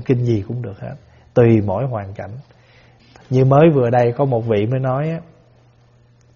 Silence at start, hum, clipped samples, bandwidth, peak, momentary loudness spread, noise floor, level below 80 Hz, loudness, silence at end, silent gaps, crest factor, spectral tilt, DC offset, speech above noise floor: 0 s; none; under 0.1%; 6.8 kHz; 0 dBFS; 19 LU; -52 dBFS; -50 dBFS; -17 LUFS; 1.15 s; none; 18 dB; -8.5 dB/octave; under 0.1%; 35 dB